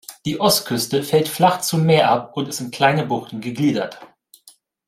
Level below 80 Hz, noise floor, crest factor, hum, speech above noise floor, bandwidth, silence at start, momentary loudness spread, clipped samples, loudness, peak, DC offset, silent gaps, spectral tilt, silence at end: -60 dBFS; -52 dBFS; 18 dB; none; 33 dB; 16 kHz; 0.1 s; 10 LU; under 0.1%; -19 LUFS; -2 dBFS; under 0.1%; none; -4.5 dB/octave; 0.85 s